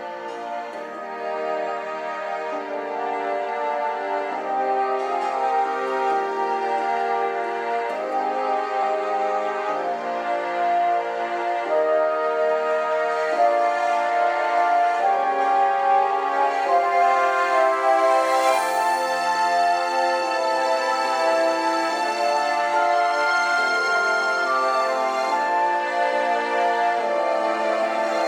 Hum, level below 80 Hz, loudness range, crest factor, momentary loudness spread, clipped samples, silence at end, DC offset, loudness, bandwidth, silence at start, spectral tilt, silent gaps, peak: none; under -90 dBFS; 5 LU; 14 dB; 7 LU; under 0.1%; 0 s; under 0.1%; -22 LUFS; 16 kHz; 0 s; -2 dB/octave; none; -8 dBFS